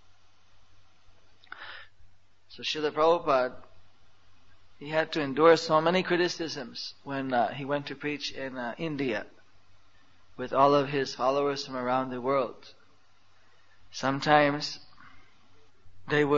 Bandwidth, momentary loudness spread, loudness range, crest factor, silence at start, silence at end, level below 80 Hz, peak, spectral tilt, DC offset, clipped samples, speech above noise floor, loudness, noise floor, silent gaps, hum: 8 kHz; 19 LU; 6 LU; 24 dB; 1.55 s; 0 s; -66 dBFS; -6 dBFS; -5 dB/octave; 0.3%; under 0.1%; 38 dB; -28 LUFS; -65 dBFS; none; none